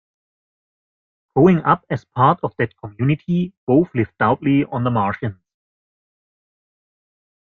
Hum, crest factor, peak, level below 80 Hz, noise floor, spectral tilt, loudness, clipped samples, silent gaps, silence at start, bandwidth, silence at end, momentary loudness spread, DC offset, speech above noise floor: none; 20 dB; -2 dBFS; -54 dBFS; under -90 dBFS; -10 dB/octave; -19 LUFS; under 0.1%; 3.57-3.67 s; 1.35 s; 6.4 kHz; 2.25 s; 10 LU; under 0.1%; over 72 dB